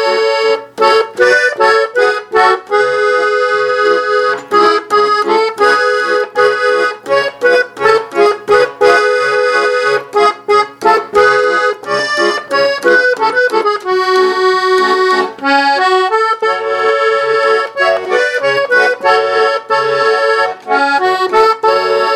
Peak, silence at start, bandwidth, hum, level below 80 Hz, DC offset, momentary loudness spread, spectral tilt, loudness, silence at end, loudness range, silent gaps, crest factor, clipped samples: 0 dBFS; 0 s; 13 kHz; none; -56 dBFS; under 0.1%; 4 LU; -2.5 dB/octave; -11 LUFS; 0 s; 1 LU; none; 12 dB; under 0.1%